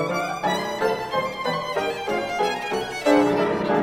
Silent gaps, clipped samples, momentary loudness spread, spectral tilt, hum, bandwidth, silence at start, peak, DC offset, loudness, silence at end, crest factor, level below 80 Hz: none; under 0.1%; 7 LU; -5 dB/octave; none; 16.5 kHz; 0 s; -4 dBFS; under 0.1%; -23 LUFS; 0 s; 18 dB; -56 dBFS